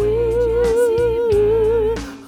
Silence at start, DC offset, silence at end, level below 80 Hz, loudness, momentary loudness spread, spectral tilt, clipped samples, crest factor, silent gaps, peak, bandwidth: 0 s; under 0.1%; 0 s; -32 dBFS; -17 LUFS; 2 LU; -6.5 dB/octave; under 0.1%; 10 dB; none; -8 dBFS; 14 kHz